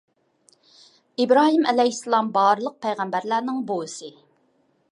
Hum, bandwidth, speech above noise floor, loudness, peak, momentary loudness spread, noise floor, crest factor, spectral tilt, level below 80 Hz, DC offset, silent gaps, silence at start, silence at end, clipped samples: none; 11.5 kHz; 44 dB; -21 LUFS; -4 dBFS; 16 LU; -65 dBFS; 18 dB; -4 dB/octave; -82 dBFS; under 0.1%; none; 1.2 s; 0.8 s; under 0.1%